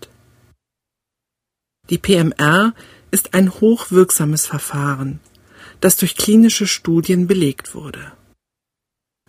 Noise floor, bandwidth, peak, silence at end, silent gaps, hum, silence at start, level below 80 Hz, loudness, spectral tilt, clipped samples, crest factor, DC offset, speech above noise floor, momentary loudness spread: -83 dBFS; 16 kHz; 0 dBFS; 1.2 s; none; none; 1.9 s; -50 dBFS; -15 LUFS; -4.5 dB/octave; under 0.1%; 18 dB; under 0.1%; 68 dB; 15 LU